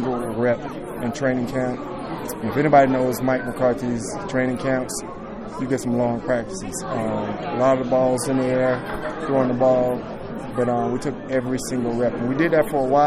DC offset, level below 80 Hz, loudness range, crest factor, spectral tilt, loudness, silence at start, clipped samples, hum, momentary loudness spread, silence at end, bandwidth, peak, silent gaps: under 0.1%; -46 dBFS; 3 LU; 18 dB; -6 dB/octave; -22 LUFS; 0 s; under 0.1%; none; 11 LU; 0 s; 15 kHz; -4 dBFS; none